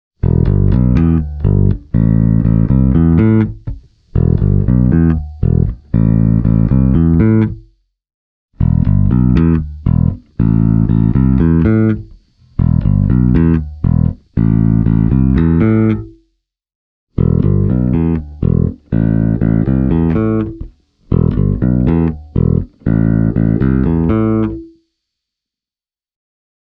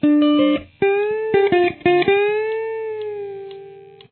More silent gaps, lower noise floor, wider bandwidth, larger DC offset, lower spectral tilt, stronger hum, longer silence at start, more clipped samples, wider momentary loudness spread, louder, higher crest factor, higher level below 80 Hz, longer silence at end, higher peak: first, 8.14-8.49 s, 16.75-17.07 s vs none; first, under -90 dBFS vs -41 dBFS; second, 3.9 kHz vs 4.4 kHz; neither; first, -12.5 dB/octave vs -9.5 dB/octave; neither; first, 0.25 s vs 0 s; neither; second, 6 LU vs 15 LU; first, -13 LUFS vs -18 LUFS; about the same, 12 dB vs 14 dB; first, -22 dBFS vs -56 dBFS; first, 2.1 s vs 0.25 s; first, 0 dBFS vs -4 dBFS